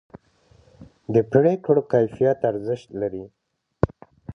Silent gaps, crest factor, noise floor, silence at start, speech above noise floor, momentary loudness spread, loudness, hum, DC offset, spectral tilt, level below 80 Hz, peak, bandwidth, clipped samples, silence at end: none; 22 dB; -57 dBFS; 0.8 s; 37 dB; 11 LU; -22 LUFS; none; under 0.1%; -9.5 dB/octave; -46 dBFS; -2 dBFS; 6.6 kHz; under 0.1%; 0 s